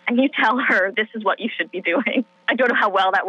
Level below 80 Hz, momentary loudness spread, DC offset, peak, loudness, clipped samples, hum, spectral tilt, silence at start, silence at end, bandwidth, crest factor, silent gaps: -86 dBFS; 6 LU; under 0.1%; -6 dBFS; -19 LUFS; under 0.1%; none; -5 dB/octave; 0.05 s; 0 s; 7.8 kHz; 14 dB; none